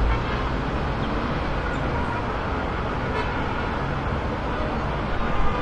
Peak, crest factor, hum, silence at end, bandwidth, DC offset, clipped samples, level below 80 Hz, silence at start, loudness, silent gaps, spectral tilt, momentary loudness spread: -8 dBFS; 16 dB; none; 0 s; 9.2 kHz; under 0.1%; under 0.1%; -30 dBFS; 0 s; -26 LUFS; none; -7 dB/octave; 1 LU